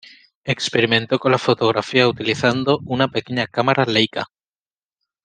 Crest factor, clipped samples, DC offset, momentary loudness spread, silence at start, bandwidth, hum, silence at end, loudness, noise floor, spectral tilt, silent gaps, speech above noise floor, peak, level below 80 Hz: 18 dB; under 0.1%; under 0.1%; 6 LU; 0.45 s; 9.8 kHz; none; 1 s; -18 LUFS; under -90 dBFS; -5 dB/octave; none; over 71 dB; 0 dBFS; -58 dBFS